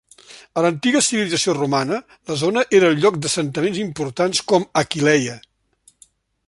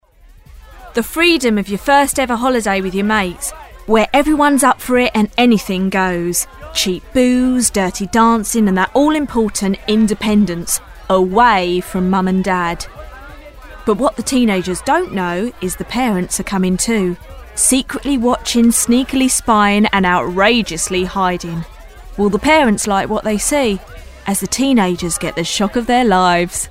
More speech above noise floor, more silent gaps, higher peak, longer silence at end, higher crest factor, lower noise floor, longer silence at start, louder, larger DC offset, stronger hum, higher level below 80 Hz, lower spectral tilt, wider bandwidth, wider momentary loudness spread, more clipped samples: first, 39 dB vs 29 dB; neither; about the same, -2 dBFS vs 0 dBFS; first, 1.1 s vs 0 s; about the same, 18 dB vs 14 dB; first, -57 dBFS vs -43 dBFS; second, 0.3 s vs 0.5 s; second, -19 LUFS vs -15 LUFS; second, under 0.1% vs 0.2%; neither; second, -60 dBFS vs -36 dBFS; about the same, -4 dB/octave vs -4 dB/octave; second, 11.5 kHz vs 16 kHz; about the same, 10 LU vs 9 LU; neither